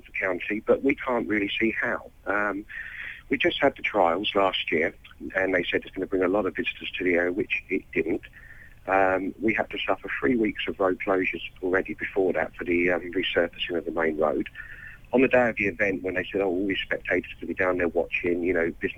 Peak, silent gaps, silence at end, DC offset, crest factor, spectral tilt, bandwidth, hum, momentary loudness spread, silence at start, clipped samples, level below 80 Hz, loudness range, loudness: -10 dBFS; none; 0 s; under 0.1%; 16 dB; -6.5 dB/octave; 15 kHz; none; 7 LU; 0.05 s; under 0.1%; -50 dBFS; 2 LU; -26 LUFS